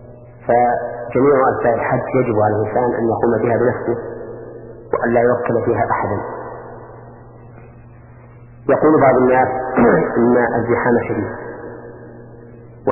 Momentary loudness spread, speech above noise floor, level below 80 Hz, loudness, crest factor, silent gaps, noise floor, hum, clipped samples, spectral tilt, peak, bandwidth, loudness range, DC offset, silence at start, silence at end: 20 LU; 25 dB; -46 dBFS; -16 LUFS; 16 dB; none; -40 dBFS; none; under 0.1%; -13 dB/octave; 0 dBFS; 2.9 kHz; 6 LU; under 0.1%; 0 s; 0 s